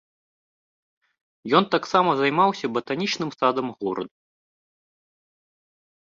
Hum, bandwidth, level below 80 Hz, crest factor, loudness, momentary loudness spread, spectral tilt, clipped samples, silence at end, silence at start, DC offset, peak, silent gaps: none; 7.6 kHz; -68 dBFS; 22 dB; -23 LUFS; 10 LU; -5 dB/octave; under 0.1%; 1.95 s; 1.45 s; under 0.1%; -4 dBFS; none